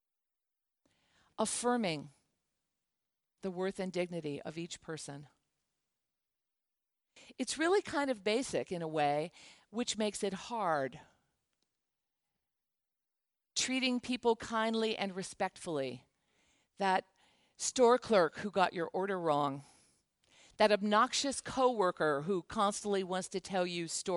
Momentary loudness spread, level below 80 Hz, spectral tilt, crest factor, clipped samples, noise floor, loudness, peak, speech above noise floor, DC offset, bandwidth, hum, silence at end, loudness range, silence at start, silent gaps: 13 LU; -72 dBFS; -3.5 dB/octave; 22 dB; under 0.1%; -89 dBFS; -34 LUFS; -14 dBFS; 55 dB; under 0.1%; 11.5 kHz; none; 0 s; 10 LU; 1.4 s; none